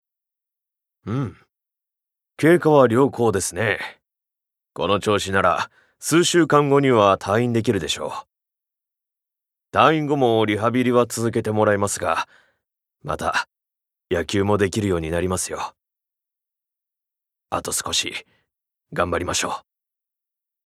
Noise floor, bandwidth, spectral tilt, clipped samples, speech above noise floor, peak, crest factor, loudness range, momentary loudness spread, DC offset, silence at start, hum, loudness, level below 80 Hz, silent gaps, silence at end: -84 dBFS; 15.5 kHz; -4.5 dB/octave; under 0.1%; 65 dB; 0 dBFS; 22 dB; 8 LU; 15 LU; under 0.1%; 1.05 s; none; -20 LUFS; -56 dBFS; none; 1.05 s